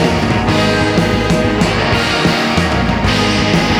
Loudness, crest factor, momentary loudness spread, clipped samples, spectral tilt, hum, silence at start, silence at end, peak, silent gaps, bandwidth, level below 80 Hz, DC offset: -13 LUFS; 12 dB; 1 LU; under 0.1%; -5 dB/octave; none; 0 s; 0 s; -2 dBFS; none; 17 kHz; -26 dBFS; under 0.1%